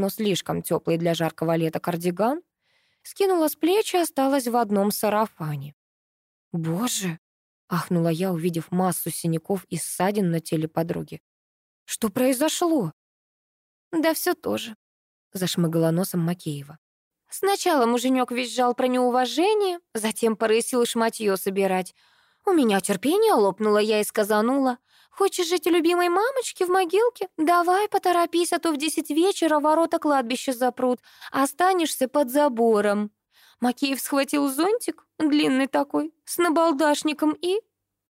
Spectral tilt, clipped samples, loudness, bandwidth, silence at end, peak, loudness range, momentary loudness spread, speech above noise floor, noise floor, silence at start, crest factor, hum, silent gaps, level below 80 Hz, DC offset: -4.5 dB/octave; under 0.1%; -23 LUFS; 16 kHz; 0.55 s; -10 dBFS; 5 LU; 9 LU; 46 dB; -68 dBFS; 0 s; 14 dB; none; 5.73-6.51 s, 7.18-7.68 s, 11.20-11.86 s, 12.93-13.91 s, 14.75-15.31 s, 16.78-17.11 s; -70 dBFS; under 0.1%